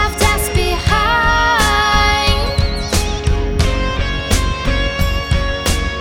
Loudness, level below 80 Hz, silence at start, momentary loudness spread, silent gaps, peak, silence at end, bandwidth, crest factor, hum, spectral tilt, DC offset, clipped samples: -15 LUFS; -20 dBFS; 0 s; 6 LU; none; 0 dBFS; 0 s; 19 kHz; 14 dB; none; -4 dB/octave; under 0.1%; under 0.1%